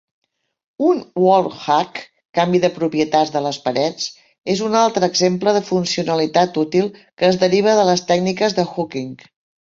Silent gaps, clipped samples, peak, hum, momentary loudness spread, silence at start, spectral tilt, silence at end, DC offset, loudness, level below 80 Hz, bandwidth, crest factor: 2.25-2.33 s, 4.38-4.42 s, 7.13-7.17 s; under 0.1%; -2 dBFS; none; 10 LU; 0.8 s; -5 dB/octave; 0.5 s; under 0.1%; -18 LUFS; -60 dBFS; 7.8 kHz; 16 dB